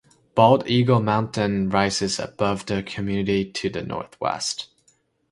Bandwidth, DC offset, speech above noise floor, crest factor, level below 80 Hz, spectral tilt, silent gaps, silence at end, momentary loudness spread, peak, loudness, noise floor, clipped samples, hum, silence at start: 11.5 kHz; under 0.1%; 42 dB; 22 dB; -50 dBFS; -5.5 dB/octave; none; 0.65 s; 10 LU; 0 dBFS; -22 LUFS; -64 dBFS; under 0.1%; none; 0.35 s